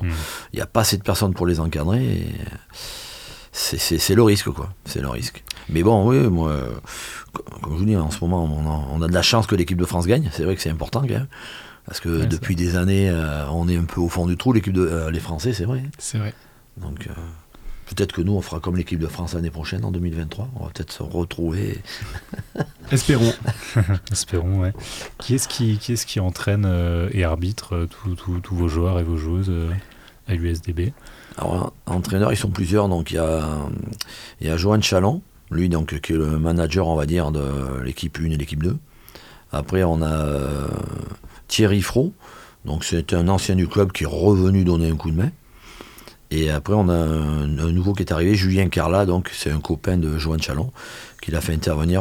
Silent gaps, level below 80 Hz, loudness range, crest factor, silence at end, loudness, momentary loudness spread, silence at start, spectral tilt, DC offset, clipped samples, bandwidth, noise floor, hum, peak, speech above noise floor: none; -36 dBFS; 6 LU; 20 dB; 0 s; -22 LUFS; 14 LU; 0 s; -6 dB/octave; under 0.1%; under 0.1%; 19.5 kHz; -44 dBFS; none; -2 dBFS; 23 dB